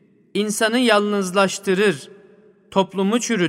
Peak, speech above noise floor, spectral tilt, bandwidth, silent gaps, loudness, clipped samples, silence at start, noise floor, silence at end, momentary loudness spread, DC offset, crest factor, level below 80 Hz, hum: -2 dBFS; 32 dB; -4 dB/octave; 16 kHz; none; -19 LUFS; under 0.1%; 0.35 s; -51 dBFS; 0 s; 8 LU; under 0.1%; 18 dB; -66 dBFS; none